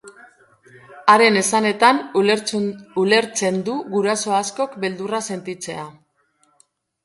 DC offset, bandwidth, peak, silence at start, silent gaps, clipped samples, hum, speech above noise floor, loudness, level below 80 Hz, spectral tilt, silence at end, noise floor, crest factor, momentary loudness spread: under 0.1%; 12 kHz; 0 dBFS; 0.05 s; none; under 0.1%; none; 44 dB; -19 LUFS; -68 dBFS; -3.5 dB/octave; 1.15 s; -63 dBFS; 20 dB; 14 LU